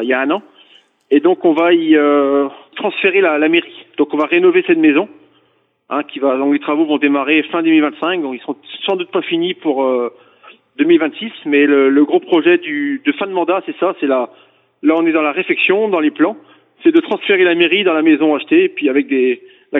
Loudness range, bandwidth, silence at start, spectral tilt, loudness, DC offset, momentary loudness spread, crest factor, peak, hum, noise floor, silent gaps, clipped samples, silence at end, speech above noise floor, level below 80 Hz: 3 LU; 4 kHz; 0 s; -7.5 dB/octave; -14 LUFS; under 0.1%; 9 LU; 14 dB; 0 dBFS; none; -59 dBFS; none; under 0.1%; 0 s; 45 dB; -70 dBFS